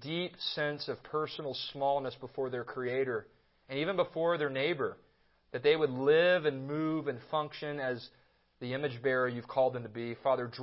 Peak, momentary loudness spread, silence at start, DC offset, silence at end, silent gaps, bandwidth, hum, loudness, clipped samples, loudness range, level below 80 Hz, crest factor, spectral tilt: -16 dBFS; 11 LU; 0 s; under 0.1%; 0 s; none; 5.8 kHz; none; -33 LUFS; under 0.1%; 5 LU; -74 dBFS; 18 dB; -9 dB/octave